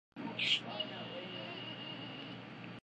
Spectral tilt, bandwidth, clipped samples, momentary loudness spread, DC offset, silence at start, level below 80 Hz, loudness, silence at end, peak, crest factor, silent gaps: -3.5 dB/octave; 10 kHz; under 0.1%; 14 LU; under 0.1%; 0.15 s; -80 dBFS; -39 LUFS; 0.05 s; -20 dBFS; 22 dB; none